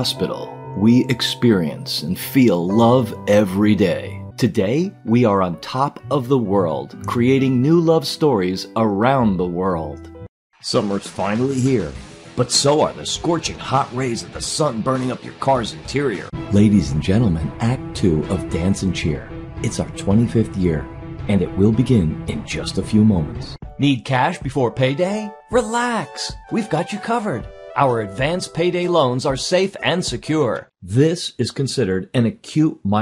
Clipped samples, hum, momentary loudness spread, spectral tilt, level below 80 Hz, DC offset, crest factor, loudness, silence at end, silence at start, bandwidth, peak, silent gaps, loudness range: under 0.1%; none; 10 LU; -6 dB/octave; -42 dBFS; under 0.1%; 16 dB; -19 LUFS; 0 s; 0 s; 16 kHz; -2 dBFS; 10.29-10.50 s; 4 LU